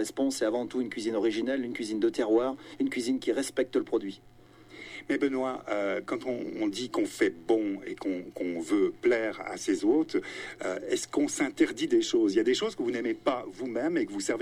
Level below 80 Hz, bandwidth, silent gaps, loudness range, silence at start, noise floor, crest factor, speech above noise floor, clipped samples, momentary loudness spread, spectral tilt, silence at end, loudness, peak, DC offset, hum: -66 dBFS; 15.5 kHz; none; 3 LU; 0 s; -51 dBFS; 18 dB; 22 dB; under 0.1%; 8 LU; -4 dB/octave; 0 s; -30 LUFS; -12 dBFS; under 0.1%; none